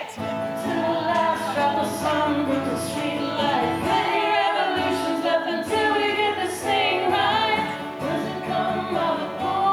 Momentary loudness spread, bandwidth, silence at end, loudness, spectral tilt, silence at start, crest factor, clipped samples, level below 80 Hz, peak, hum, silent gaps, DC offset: 6 LU; over 20 kHz; 0 s; -23 LUFS; -4.5 dB/octave; 0 s; 14 dB; under 0.1%; -58 dBFS; -8 dBFS; none; none; under 0.1%